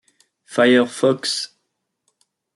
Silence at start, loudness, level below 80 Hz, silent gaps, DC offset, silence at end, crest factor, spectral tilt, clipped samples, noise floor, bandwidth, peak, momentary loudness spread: 0.5 s; -18 LUFS; -74 dBFS; none; under 0.1%; 1.1 s; 18 dB; -4 dB/octave; under 0.1%; -75 dBFS; 12 kHz; -2 dBFS; 12 LU